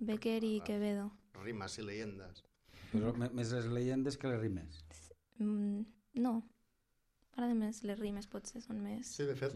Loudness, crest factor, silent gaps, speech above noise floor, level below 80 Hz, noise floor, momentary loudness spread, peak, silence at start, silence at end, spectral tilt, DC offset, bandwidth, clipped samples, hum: -40 LUFS; 16 dB; none; 40 dB; -66 dBFS; -79 dBFS; 13 LU; -24 dBFS; 0 s; 0 s; -6 dB/octave; under 0.1%; 12.5 kHz; under 0.1%; none